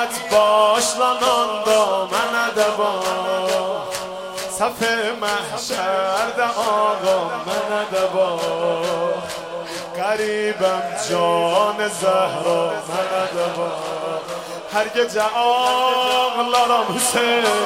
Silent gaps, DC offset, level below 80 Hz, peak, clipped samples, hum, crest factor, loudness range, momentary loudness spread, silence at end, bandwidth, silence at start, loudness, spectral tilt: none; under 0.1%; -60 dBFS; -4 dBFS; under 0.1%; none; 16 dB; 4 LU; 9 LU; 0 s; 16.5 kHz; 0 s; -19 LUFS; -2.5 dB/octave